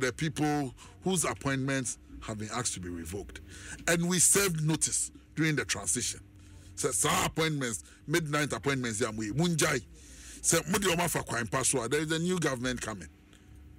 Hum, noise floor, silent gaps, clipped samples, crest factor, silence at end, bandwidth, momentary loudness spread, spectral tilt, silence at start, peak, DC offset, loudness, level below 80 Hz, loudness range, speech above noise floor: none; -54 dBFS; none; under 0.1%; 18 dB; 0 s; 16 kHz; 13 LU; -3.5 dB/octave; 0 s; -14 dBFS; under 0.1%; -29 LUFS; -54 dBFS; 5 LU; 23 dB